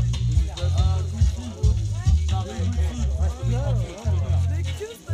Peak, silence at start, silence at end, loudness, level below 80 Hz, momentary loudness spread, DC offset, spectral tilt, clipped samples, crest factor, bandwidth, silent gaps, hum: -8 dBFS; 0 s; 0 s; -24 LUFS; -26 dBFS; 4 LU; under 0.1%; -6.5 dB/octave; under 0.1%; 14 dB; 10.5 kHz; none; none